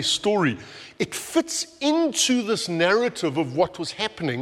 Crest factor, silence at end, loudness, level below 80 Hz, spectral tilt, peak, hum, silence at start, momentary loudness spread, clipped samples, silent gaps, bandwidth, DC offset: 16 dB; 0 s; -23 LUFS; -62 dBFS; -3.5 dB/octave; -6 dBFS; none; 0 s; 8 LU; under 0.1%; none; 16 kHz; under 0.1%